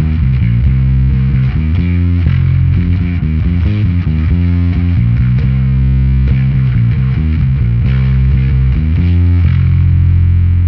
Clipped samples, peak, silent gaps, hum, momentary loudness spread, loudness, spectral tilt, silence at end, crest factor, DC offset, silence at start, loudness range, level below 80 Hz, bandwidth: under 0.1%; 0 dBFS; none; none; 3 LU; -12 LUFS; -11 dB/octave; 0 s; 10 dB; under 0.1%; 0 s; 1 LU; -16 dBFS; 4.7 kHz